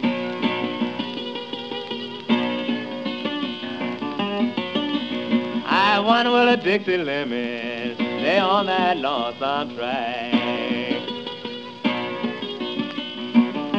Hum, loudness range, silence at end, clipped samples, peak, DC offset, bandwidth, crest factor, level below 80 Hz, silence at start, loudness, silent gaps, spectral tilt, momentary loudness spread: none; 6 LU; 0 s; under 0.1%; -2 dBFS; 0.2%; 7.4 kHz; 20 dB; -72 dBFS; 0 s; -23 LUFS; none; -6 dB/octave; 11 LU